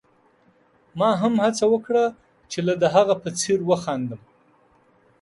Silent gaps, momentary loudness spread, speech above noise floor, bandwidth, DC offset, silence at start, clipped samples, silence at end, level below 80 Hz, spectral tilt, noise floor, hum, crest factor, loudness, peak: none; 12 LU; 39 dB; 11.5 kHz; under 0.1%; 0.95 s; under 0.1%; 1.05 s; -64 dBFS; -5 dB/octave; -59 dBFS; none; 20 dB; -22 LUFS; -4 dBFS